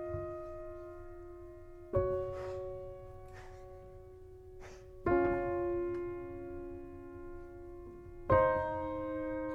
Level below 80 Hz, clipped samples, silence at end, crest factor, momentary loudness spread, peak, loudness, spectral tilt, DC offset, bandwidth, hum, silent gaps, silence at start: -52 dBFS; under 0.1%; 0 s; 22 dB; 21 LU; -16 dBFS; -36 LUFS; -9 dB/octave; under 0.1%; 7.4 kHz; none; none; 0 s